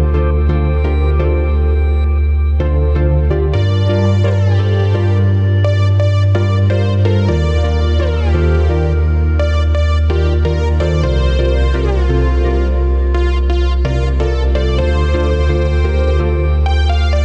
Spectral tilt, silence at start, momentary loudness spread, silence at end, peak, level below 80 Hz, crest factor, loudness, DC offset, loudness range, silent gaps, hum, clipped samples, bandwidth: -8 dB/octave; 0 s; 2 LU; 0 s; -2 dBFS; -14 dBFS; 10 dB; -14 LUFS; under 0.1%; 2 LU; none; none; under 0.1%; 7.4 kHz